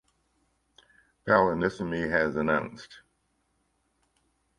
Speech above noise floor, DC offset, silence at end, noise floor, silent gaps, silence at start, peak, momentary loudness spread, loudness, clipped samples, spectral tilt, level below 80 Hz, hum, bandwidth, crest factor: 47 dB; under 0.1%; 1.6 s; -74 dBFS; none; 1.25 s; -8 dBFS; 18 LU; -26 LUFS; under 0.1%; -7 dB/octave; -58 dBFS; none; 11 kHz; 24 dB